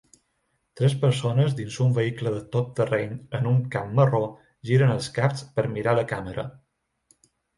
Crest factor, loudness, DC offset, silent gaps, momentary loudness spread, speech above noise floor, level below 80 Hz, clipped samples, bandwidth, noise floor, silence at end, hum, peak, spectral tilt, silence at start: 18 dB; -25 LUFS; under 0.1%; none; 10 LU; 50 dB; -58 dBFS; under 0.1%; 11.5 kHz; -73 dBFS; 1.05 s; none; -8 dBFS; -7 dB/octave; 0.75 s